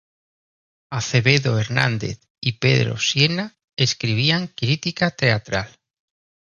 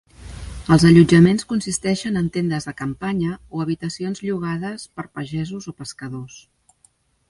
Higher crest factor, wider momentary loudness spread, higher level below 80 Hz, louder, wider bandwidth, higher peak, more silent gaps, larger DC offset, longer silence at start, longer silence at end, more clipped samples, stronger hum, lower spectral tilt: about the same, 20 dB vs 20 dB; second, 10 LU vs 21 LU; second, -52 dBFS vs -44 dBFS; about the same, -20 LUFS vs -19 LUFS; second, 7.4 kHz vs 11.5 kHz; about the same, 0 dBFS vs 0 dBFS; first, 2.30-2.35 s, 3.64-3.68 s vs none; neither; first, 0.9 s vs 0.2 s; about the same, 0.85 s vs 0.9 s; neither; neither; second, -4.5 dB/octave vs -6 dB/octave